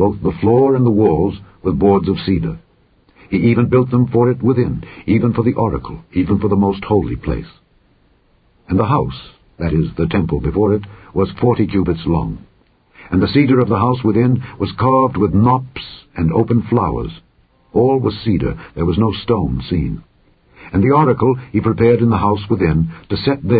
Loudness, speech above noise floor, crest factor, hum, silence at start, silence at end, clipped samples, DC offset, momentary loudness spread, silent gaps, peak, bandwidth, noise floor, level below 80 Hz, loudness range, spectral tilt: -16 LUFS; 40 dB; 16 dB; none; 0 s; 0 s; under 0.1%; under 0.1%; 10 LU; none; 0 dBFS; 4.9 kHz; -55 dBFS; -32 dBFS; 4 LU; -13.5 dB/octave